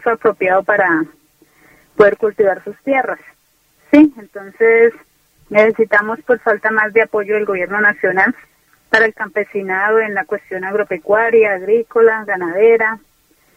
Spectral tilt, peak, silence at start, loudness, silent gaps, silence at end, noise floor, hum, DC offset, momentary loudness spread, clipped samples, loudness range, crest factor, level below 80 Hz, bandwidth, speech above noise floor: -6.5 dB/octave; 0 dBFS; 0 s; -14 LUFS; none; 0.6 s; -57 dBFS; none; under 0.1%; 10 LU; under 0.1%; 2 LU; 16 dB; -58 dBFS; 7.8 kHz; 42 dB